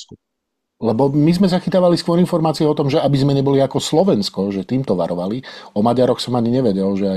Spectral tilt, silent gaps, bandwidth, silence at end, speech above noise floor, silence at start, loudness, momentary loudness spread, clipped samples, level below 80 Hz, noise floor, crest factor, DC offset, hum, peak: -7 dB/octave; none; 13.5 kHz; 0 s; 60 dB; 0 s; -17 LUFS; 6 LU; under 0.1%; -50 dBFS; -76 dBFS; 14 dB; under 0.1%; none; -2 dBFS